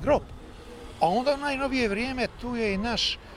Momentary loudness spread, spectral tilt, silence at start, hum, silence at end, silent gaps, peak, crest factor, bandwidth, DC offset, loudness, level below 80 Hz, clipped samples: 19 LU; -4.5 dB/octave; 0 s; none; 0 s; none; -8 dBFS; 18 dB; 14 kHz; under 0.1%; -27 LUFS; -44 dBFS; under 0.1%